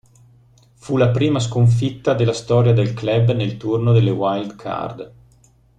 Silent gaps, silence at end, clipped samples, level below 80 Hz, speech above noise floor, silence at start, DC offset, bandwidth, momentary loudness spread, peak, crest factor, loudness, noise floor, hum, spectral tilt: none; 0.7 s; under 0.1%; -48 dBFS; 36 dB; 0.85 s; under 0.1%; 9 kHz; 11 LU; -4 dBFS; 14 dB; -18 LUFS; -53 dBFS; none; -7.5 dB/octave